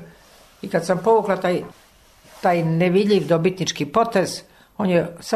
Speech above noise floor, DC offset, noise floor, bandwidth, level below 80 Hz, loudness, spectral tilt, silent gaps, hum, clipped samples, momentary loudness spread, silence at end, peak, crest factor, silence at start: 32 dB; under 0.1%; -51 dBFS; 13.5 kHz; -58 dBFS; -20 LUFS; -5.5 dB/octave; none; none; under 0.1%; 9 LU; 0 s; -6 dBFS; 16 dB; 0 s